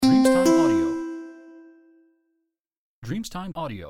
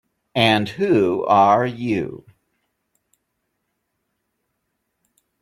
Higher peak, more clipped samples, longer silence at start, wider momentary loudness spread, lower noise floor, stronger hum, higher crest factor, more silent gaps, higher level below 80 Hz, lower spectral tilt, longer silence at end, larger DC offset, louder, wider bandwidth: second, -8 dBFS vs -2 dBFS; neither; second, 0 s vs 0.35 s; first, 21 LU vs 10 LU; about the same, -78 dBFS vs -75 dBFS; neither; about the same, 16 dB vs 20 dB; first, 2.60-2.64 s, 2.78-3.02 s vs none; first, -52 dBFS vs -60 dBFS; about the same, -5.5 dB/octave vs -6 dB/octave; second, 0 s vs 3.25 s; neither; second, -22 LUFS vs -18 LUFS; first, 16 kHz vs 14.5 kHz